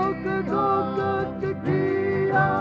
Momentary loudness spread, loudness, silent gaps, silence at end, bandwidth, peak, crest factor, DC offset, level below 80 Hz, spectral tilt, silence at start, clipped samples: 6 LU; -24 LUFS; none; 0 s; 6.6 kHz; -8 dBFS; 14 dB; under 0.1%; -52 dBFS; -9 dB/octave; 0 s; under 0.1%